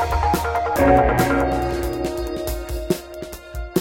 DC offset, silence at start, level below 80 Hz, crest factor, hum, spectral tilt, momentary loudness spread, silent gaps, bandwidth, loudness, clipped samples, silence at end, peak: under 0.1%; 0 s; -30 dBFS; 18 dB; none; -6 dB/octave; 16 LU; none; 17 kHz; -21 LUFS; under 0.1%; 0 s; -2 dBFS